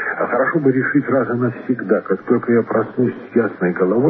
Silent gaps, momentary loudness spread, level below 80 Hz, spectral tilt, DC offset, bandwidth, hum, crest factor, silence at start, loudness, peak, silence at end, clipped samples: none; 4 LU; -64 dBFS; -12 dB/octave; under 0.1%; 4 kHz; none; 16 dB; 0 s; -18 LUFS; -2 dBFS; 0 s; under 0.1%